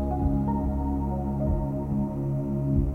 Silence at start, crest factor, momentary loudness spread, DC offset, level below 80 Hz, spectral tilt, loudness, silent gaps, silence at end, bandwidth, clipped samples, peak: 0 s; 12 dB; 3 LU; under 0.1%; -32 dBFS; -11.5 dB/octave; -28 LUFS; none; 0 s; 2.7 kHz; under 0.1%; -14 dBFS